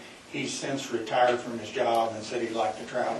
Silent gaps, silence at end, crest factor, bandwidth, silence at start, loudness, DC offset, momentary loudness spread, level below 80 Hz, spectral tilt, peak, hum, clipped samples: none; 0 s; 18 dB; 12 kHz; 0 s; -29 LUFS; under 0.1%; 8 LU; -70 dBFS; -3.5 dB/octave; -10 dBFS; none; under 0.1%